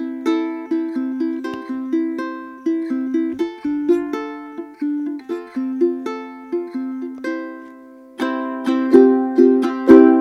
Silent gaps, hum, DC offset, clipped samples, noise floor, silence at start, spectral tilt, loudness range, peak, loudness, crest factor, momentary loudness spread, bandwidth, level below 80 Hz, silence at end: none; none; under 0.1%; 0.1%; -41 dBFS; 0 s; -6.5 dB/octave; 7 LU; 0 dBFS; -19 LUFS; 18 dB; 16 LU; 7 kHz; -60 dBFS; 0 s